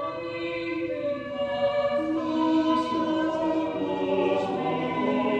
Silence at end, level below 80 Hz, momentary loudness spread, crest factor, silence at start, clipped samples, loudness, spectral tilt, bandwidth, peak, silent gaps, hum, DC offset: 0 s; -60 dBFS; 6 LU; 14 dB; 0 s; under 0.1%; -27 LUFS; -6.5 dB/octave; 8.4 kHz; -12 dBFS; none; none; under 0.1%